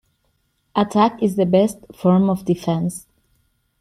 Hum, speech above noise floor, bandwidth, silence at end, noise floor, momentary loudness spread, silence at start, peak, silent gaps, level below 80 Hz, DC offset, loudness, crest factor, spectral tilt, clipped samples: none; 49 dB; 13.5 kHz; 0.8 s; -67 dBFS; 8 LU; 0.75 s; -4 dBFS; none; -56 dBFS; under 0.1%; -19 LUFS; 16 dB; -7 dB/octave; under 0.1%